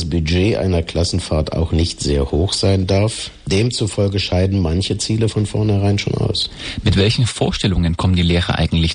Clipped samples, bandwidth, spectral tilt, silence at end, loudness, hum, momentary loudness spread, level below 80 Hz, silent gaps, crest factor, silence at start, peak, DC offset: under 0.1%; 10.5 kHz; -5.5 dB/octave; 0 s; -17 LUFS; none; 4 LU; -28 dBFS; none; 14 dB; 0 s; -2 dBFS; under 0.1%